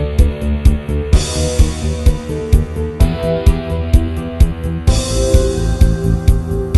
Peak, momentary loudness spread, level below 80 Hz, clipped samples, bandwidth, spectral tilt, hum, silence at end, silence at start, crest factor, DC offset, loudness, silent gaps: 0 dBFS; 4 LU; -16 dBFS; 0.3%; 12.5 kHz; -6 dB/octave; none; 0 s; 0 s; 12 dB; under 0.1%; -16 LUFS; none